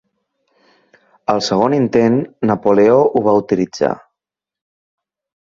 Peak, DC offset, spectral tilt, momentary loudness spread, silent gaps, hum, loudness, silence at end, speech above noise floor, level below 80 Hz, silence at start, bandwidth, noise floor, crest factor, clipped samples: -2 dBFS; under 0.1%; -6.5 dB/octave; 8 LU; none; none; -15 LUFS; 1.45 s; 71 dB; -54 dBFS; 1.3 s; 7.6 kHz; -84 dBFS; 16 dB; under 0.1%